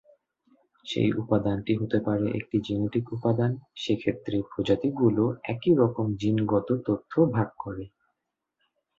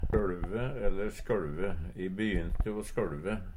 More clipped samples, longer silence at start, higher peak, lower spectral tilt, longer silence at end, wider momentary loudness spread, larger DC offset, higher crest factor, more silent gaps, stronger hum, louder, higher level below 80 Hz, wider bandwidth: neither; first, 0.85 s vs 0 s; first, -8 dBFS vs -14 dBFS; about the same, -8 dB/octave vs -7 dB/octave; first, 1.15 s vs 0 s; first, 8 LU vs 5 LU; neither; about the same, 18 dB vs 16 dB; neither; neither; first, -27 LUFS vs -35 LUFS; second, -56 dBFS vs -36 dBFS; second, 7.6 kHz vs 13 kHz